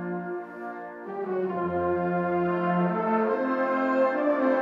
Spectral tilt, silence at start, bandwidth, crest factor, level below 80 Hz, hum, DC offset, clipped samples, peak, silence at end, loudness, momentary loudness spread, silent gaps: -9.5 dB/octave; 0 s; 5.6 kHz; 14 dB; -64 dBFS; none; under 0.1%; under 0.1%; -12 dBFS; 0 s; -26 LUFS; 13 LU; none